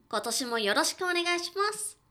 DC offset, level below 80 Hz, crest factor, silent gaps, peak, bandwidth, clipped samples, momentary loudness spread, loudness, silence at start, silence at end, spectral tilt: under 0.1%; -76 dBFS; 18 dB; none; -12 dBFS; 20 kHz; under 0.1%; 4 LU; -28 LUFS; 0.1 s; 0.2 s; -1 dB/octave